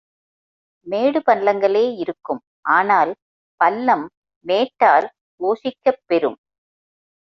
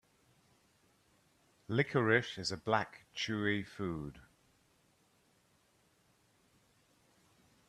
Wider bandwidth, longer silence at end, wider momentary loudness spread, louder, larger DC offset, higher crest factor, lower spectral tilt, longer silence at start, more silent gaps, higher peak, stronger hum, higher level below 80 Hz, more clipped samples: second, 6.2 kHz vs 13.5 kHz; second, 0.95 s vs 3.5 s; about the same, 13 LU vs 11 LU; first, -19 LUFS vs -35 LUFS; neither; second, 18 dB vs 26 dB; about the same, -6 dB/octave vs -5.5 dB/octave; second, 0.85 s vs 1.7 s; first, 2.47-2.63 s, 3.22-3.58 s, 4.17-4.22 s, 4.36-4.41 s, 5.21-5.38 s vs none; first, -2 dBFS vs -14 dBFS; neither; about the same, -70 dBFS vs -70 dBFS; neither